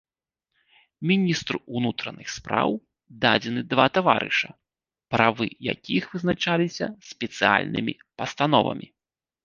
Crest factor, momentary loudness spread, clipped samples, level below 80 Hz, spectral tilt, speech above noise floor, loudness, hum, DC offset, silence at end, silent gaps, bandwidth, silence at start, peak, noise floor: 24 dB; 12 LU; under 0.1%; -60 dBFS; -5 dB/octave; 64 dB; -24 LUFS; none; under 0.1%; 0.6 s; none; 7.4 kHz; 1 s; -2 dBFS; -88 dBFS